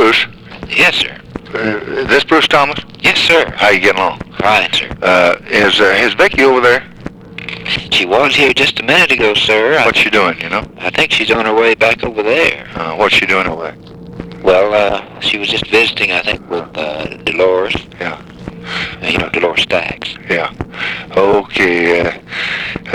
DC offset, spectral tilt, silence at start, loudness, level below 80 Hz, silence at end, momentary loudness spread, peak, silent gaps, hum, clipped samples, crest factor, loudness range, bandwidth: 0.1%; -3.5 dB/octave; 0 s; -12 LUFS; -40 dBFS; 0 s; 13 LU; 0 dBFS; none; none; under 0.1%; 12 dB; 6 LU; 19 kHz